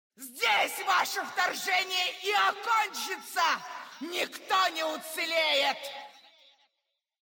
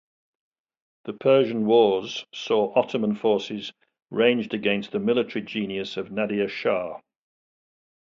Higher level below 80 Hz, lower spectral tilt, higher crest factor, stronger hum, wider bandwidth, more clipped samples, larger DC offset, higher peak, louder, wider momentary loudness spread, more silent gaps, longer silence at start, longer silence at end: second, under -90 dBFS vs -68 dBFS; second, 0.5 dB/octave vs -6 dB/octave; about the same, 16 dB vs 20 dB; neither; first, 17 kHz vs 7.4 kHz; neither; neither; second, -14 dBFS vs -6 dBFS; second, -28 LUFS vs -24 LUFS; second, 10 LU vs 13 LU; neither; second, 0.2 s vs 1.05 s; about the same, 1.15 s vs 1.2 s